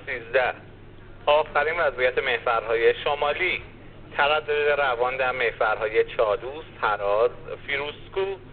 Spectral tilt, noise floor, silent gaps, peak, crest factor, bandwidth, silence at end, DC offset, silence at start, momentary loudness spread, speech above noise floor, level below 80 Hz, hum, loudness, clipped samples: -1 dB/octave; -44 dBFS; none; -8 dBFS; 18 dB; 4.6 kHz; 0 s; under 0.1%; 0 s; 8 LU; 20 dB; -48 dBFS; none; -24 LUFS; under 0.1%